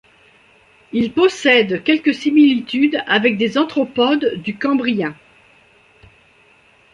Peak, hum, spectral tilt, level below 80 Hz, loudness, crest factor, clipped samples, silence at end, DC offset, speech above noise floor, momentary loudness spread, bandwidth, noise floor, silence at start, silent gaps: -2 dBFS; none; -5 dB/octave; -60 dBFS; -16 LUFS; 16 dB; under 0.1%; 1.8 s; under 0.1%; 36 dB; 8 LU; 9.2 kHz; -52 dBFS; 0.95 s; none